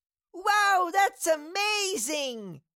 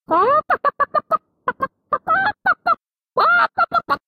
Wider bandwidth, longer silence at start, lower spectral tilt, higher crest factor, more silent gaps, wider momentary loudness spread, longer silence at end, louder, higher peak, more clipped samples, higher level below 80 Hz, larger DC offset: first, 17 kHz vs 15 kHz; first, 0.35 s vs 0.1 s; second, -1 dB/octave vs -5.5 dB/octave; about the same, 14 dB vs 14 dB; neither; about the same, 9 LU vs 9 LU; about the same, 0.15 s vs 0.1 s; second, -26 LUFS vs -19 LUFS; second, -14 dBFS vs -4 dBFS; neither; second, -76 dBFS vs -60 dBFS; neither